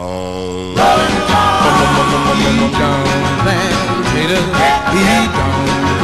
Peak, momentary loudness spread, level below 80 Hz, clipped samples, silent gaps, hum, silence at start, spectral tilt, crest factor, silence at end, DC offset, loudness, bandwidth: 0 dBFS; 4 LU; -30 dBFS; under 0.1%; none; none; 0 s; -4.5 dB/octave; 12 dB; 0 s; 1%; -13 LUFS; 13.5 kHz